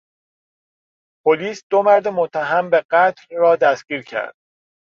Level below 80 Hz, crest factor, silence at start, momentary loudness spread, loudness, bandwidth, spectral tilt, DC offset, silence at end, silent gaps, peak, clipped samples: -70 dBFS; 16 dB; 1.25 s; 11 LU; -18 LUFS; 7.2 kHz; -5 dB/octave; under 0.1%; 0.6 s; 1.63-1.70 s, 2.85-2.89 s; -2 dBFS; under 0.1%